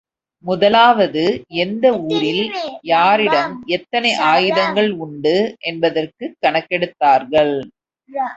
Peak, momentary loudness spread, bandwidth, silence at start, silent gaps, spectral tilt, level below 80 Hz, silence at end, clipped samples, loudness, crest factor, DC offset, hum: 0 dBFS; 10 LU; 8.2 kHz; 0.45 s; none; -5 dB/octave; -58 dBFS; 0 s; under 0.1%; -16 LUFS; 16 dB; under 0.1%; none